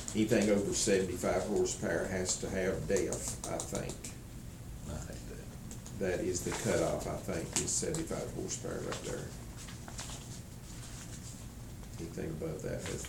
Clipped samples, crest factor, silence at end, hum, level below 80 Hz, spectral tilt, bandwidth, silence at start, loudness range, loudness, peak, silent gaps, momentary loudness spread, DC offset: under 0.1%; 24 dB; 0 s; none; -50 dBFS; -4 dB/octave; 19 kHz; 0 s; 11 LU; -35 LUFS; -12 dBFS; none; 16 LU; under 0.1%